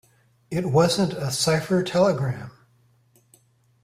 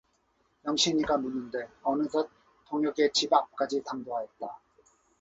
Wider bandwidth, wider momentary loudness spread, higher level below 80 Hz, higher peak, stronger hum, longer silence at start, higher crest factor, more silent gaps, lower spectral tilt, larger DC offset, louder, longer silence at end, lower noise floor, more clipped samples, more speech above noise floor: first, 16 kHz vs 8 kHz; about the same, 11 LU vs 13 LU; first, -58 dBFS vs -66 dBFS; about the same, -6 dBFS vs -8 dBFS; neither; second, 0.5 s vs 0.65 s; about the same, 18 dB vs 22 dB; neither; first, -5 dB/octave vs -3 dB/octave; neither; first, -22 LUFS vs -29 LUFS; first, 1.35 s vs 0.65 s; second, -61 dBFS vs -71 dBFS; neither; about the same, 39 dB vs 42 dB